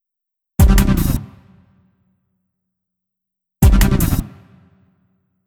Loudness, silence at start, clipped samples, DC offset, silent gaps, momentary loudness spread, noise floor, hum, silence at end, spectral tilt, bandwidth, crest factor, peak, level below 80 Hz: -16 LUFS; 0.6 s; under 0.1%; under 0.1%; none; 13 LU; -81 dBFS; none; 1.15 s; -6 dB/octave; 18.5 kHz; 18 dB; 0 dBFS; -20 dBFS